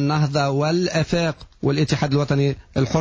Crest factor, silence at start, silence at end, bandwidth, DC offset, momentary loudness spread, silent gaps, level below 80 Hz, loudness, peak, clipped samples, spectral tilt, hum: 14 dB; 0 s; 0 s; 8 kHz; under 0.1%; 4 LU; none; -44 dBFS; -21 LUFS; -6 dBFS; under 0.1%; -6.5 dB/octave; none